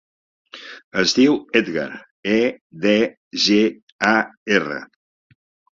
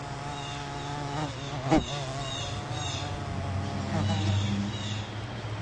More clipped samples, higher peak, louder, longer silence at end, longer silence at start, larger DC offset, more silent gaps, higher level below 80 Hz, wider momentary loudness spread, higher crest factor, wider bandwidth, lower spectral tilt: neither; first, -2 dBFS vs -10 dBFS; first, -19 LUFS vs -32 LUFS; first, 0.9 s vs 0 s; first, 0.55 s vs 0 s; neither; first, 0.84-0.91 s, 2.11-2.23 s, 2.61-2.70 s, 3.17-3.31 s, 3.82-3.99 s, 4.37-4.46 s vs none; second, -60 dBFS vs -48 dBFS; first, 14 LU vs 9 LU; about the same, 18 dB vs 22 dB; second, 7.8 kHz vs 10.5 kHz; second, -4 dB/octave vs -5.5 dB/octave